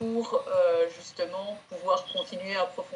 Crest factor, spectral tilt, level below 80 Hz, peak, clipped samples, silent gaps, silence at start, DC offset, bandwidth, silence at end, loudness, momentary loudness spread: 16 dB; -4 dB/octave; -82 dBFS; -12 dBFS; under 0.1%; none; 0 s; under 0.1%; 10.5 kHz; 0 s; -29 LUFS; 11 LU